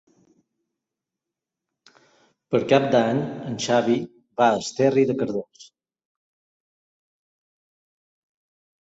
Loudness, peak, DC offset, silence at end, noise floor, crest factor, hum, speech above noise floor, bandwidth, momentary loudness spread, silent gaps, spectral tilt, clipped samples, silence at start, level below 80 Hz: -22 LUFS; -4 dBFS; under 0.1%; 3.2 s; -87 dBFS; 22 dB; none; 65 dB; 8 kHz; 11 LU; none; -5.5 dB/octave; under 0.1%; 2.5 s; -66 dBFS